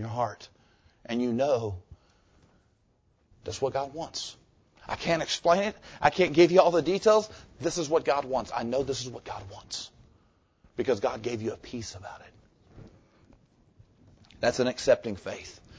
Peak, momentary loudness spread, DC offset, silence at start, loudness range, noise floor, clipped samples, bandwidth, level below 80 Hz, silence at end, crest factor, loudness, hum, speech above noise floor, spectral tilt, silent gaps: -4 dBFS; 18 LU; under 0.1%; 0 s; 12 LU; -68 dBFS; under 0.1%; 8 kHz; -56 dBFS; 0.25 s; 24 dB; -28 LUFS; none; 41 dB; -4.5 dB/octave; none